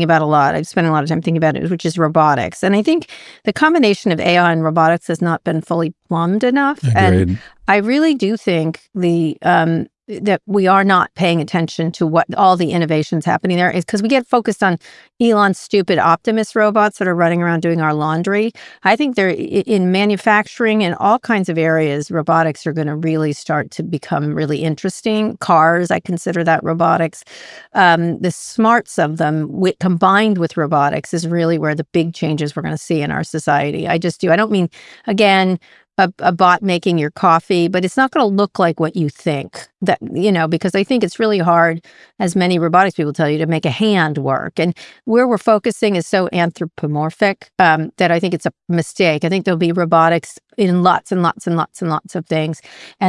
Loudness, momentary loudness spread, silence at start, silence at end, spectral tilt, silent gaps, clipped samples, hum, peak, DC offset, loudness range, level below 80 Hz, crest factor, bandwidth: -16 LUFS; 8 LU; 0 s; 0 s; -6 dB/octave; none; under 0.1%; none; 0 dBFS; under 0.1%; 2 LU; -58 dBFS; 16 dB; 12 kHz